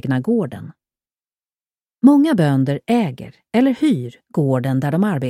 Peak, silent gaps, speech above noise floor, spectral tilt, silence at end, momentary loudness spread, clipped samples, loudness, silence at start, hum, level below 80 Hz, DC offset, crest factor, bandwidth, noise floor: 0 dBFS; none; over 73 dB; -8 dB/octave; 0 s; 12 LU; under 0.1%; -18 LUFS; 0.05 s; none; -60 dBFS; under 0.1%; 18 dB; 13 kHz; under -90 dBFS